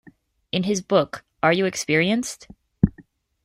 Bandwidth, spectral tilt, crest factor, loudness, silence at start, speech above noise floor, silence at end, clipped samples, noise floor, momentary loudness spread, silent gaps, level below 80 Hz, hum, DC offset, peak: 15.5 kHz; -5 dB/octave; 22 dB; -22 LUFS; 0.55 s; 32 dB; 0.45 s; under 0.1%; -54 dBFS; 10 LU; none; -46 dBFS; none; under 0.1%; -2 dBFS